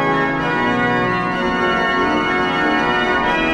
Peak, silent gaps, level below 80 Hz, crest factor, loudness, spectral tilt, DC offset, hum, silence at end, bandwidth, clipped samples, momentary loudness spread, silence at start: -4 dBFS; none; -40 dBFS; 12 dB; -17 LUFS; -5.5 dB/octave; under 0.1%; none; 0 s; 11 kHz; under 0.1%; 2 LU; 0 s